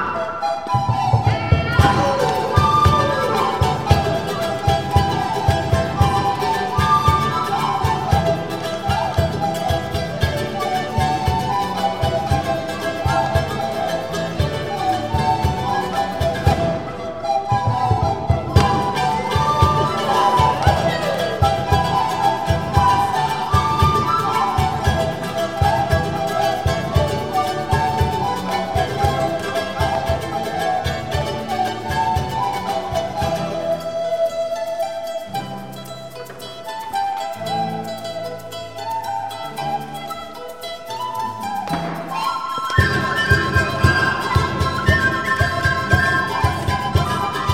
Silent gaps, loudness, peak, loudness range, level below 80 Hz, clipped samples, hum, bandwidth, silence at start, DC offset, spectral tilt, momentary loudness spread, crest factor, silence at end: none; -19 LUFS; 0 dBFS; 8 LU; -32 dBFS; under 0.1%; none; 16.5 kHz; 0 s; 0.6%; -5.5 dB/octave; 10 LU; 20 dB; 0 s